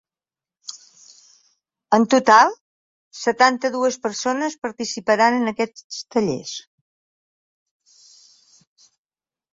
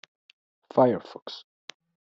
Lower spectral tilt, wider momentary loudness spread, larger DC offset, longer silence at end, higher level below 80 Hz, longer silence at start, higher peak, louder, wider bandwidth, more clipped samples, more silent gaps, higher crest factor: second, -3.5 dB/octave vs -5.5 dB/octave; second, 21 LU vs 25 LU; neither; first, 2.95 s vs 0.8 s; first, -68 dBFS vs -74 dBFS; about the same, 0.7 s vs 0.75 s; first, -2 dBFS vs -6 dBFS; first, -19 LUFS vs -25 LUFS; about the same, 7.8 kHz vs 7.6 kHz; neither; first, 2.61-3.11 s, 5.84-5.90 s vs 1.22-1.26 s; about the same, 20 dB vs 22 dB